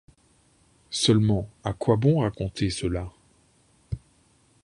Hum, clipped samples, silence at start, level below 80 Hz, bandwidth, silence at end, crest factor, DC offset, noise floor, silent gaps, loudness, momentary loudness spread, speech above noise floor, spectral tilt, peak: none; under 0.1%; 0.9 s; -46 dBFS; 11.5 kHz; 0.65 s; 20 dB; under 0.1%; -62 dBFS; none; -25 LUFS; 17 LU; 38 dB; -6 dB/octave; -6 dBFS